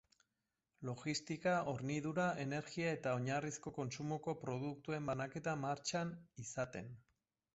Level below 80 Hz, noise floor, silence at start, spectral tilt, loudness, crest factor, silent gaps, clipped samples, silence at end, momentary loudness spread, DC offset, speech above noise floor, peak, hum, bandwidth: -74 dBFS; -90 dBFS; 0.8 s; -5 dB/octave; -42 LUFS; 18 dB; none; under 0.1%; 0.55 s; 9 LU; under 0.1%; 48 dB; -24 dBFS; none; 8 kHz